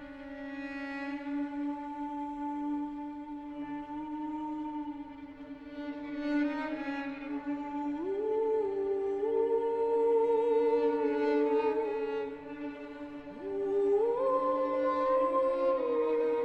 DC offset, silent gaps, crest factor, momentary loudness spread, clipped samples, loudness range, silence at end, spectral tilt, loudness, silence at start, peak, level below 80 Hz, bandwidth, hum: under 0.1%; none; 14 dB; 14 LU; under 0.1%; 9 LU; 0 s; -6.5 dB/octave; -32 LUFS; 0 s; -18 dBFS; -64 dBFS; 6 kHz; none